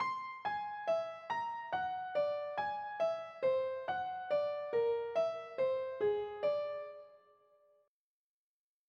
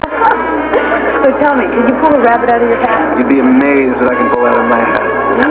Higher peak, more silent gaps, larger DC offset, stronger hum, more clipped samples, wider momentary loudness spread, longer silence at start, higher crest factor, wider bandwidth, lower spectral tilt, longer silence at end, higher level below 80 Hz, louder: second, -24 dBFS vs 0 dBFS; neither; second, under 0.1% vs 0.1%; second, none vs 60 Hz at -35 dBFS; second, under 0.1% vs 0.3%; about the same, 5 LU vs 4 LU; about the same, 0 s vs 0.05 s; about the same, 14 dB vs 10 dB; first, 7 kHz vs 4 kHz; second, -5 dB/octave vs -9.5 dB/octave; first, 1.7 s vs 0 s; second, -82 dBFS vs -38 dBFS; second, -37 LUFS vs -10 LUFS